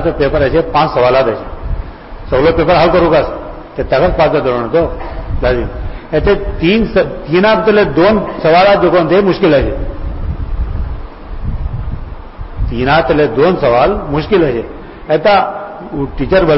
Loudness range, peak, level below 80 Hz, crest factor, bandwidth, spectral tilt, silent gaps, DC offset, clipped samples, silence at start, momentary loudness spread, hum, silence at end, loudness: 6 LU; 0 dBFS; -24 dBFS; 12 dB; 5.8 kHz; -10.5 dB/octave; none; 0.2%; under 0.1%; 0 s; 16 LU; none; 0 s; -12 LUFS